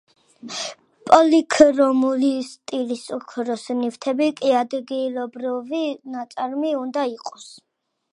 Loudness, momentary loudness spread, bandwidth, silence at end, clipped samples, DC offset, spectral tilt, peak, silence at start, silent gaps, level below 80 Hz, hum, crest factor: -21 LUFS; 17 LU; 11 kHz; 0.6 s; under 0.1%; under 0.1%; -3.5 dB/octave; 0 dBFS; 0.45 s; none; -64 dBFS; none; 20 dB